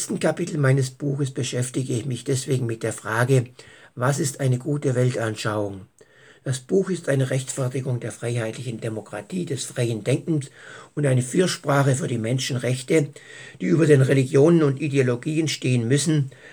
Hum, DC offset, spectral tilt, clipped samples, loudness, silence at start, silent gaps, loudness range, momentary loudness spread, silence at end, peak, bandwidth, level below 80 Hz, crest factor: none; under 0.1%; -6 dB/octave; under 0.1%; -23 LUFS; 0 s; none; 6 LU; 12 LU; 0 s; -4 dBFS; 19.5 kHz; -70 dBFS; 18 dB